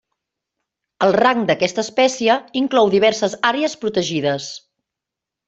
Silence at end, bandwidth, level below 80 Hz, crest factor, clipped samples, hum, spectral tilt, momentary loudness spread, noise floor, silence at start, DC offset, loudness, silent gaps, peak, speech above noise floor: 0.9 s; 8.2 kHz; -62 dBFS; 16 dB; under 0.1%; none; -4 dB/octave; 7 LU; -85 dBFS; 1 s; under 0.1%; -17 LUFS; none; -2 dBFS; 67 dB